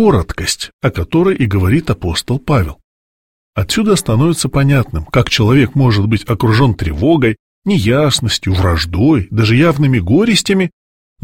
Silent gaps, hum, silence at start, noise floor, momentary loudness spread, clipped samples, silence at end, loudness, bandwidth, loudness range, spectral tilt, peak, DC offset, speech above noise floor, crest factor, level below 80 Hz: 0.73-0.79 s, 2.84-3.53 s, 7.39-7.62 s; none; 0 s; under -90 dBFS; 7 LU; under 0.1%; 0.55 s; -13 LUFS; 16.5 kHz; 3 LU; -5.5 dB/octave; 0 dBFS; 0.6%; over 78 dB; 12 dB; -30 dBFS